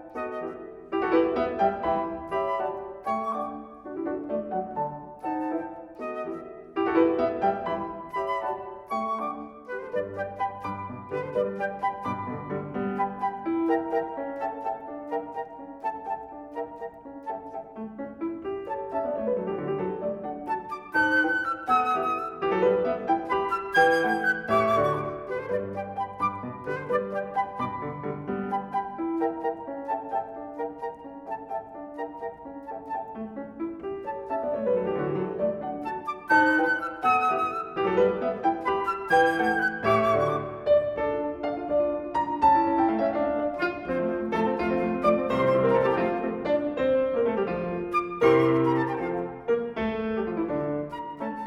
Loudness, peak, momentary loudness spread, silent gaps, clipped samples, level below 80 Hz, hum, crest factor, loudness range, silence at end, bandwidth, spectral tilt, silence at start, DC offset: -27 LUFS; -8 dBFS; 14 LU; none; under 0.1%; -58 dBFS; none; 20 dB; 9 LU; 0 s; 12.5 kHz; -7 dB/octave; 0 s; under 0.1%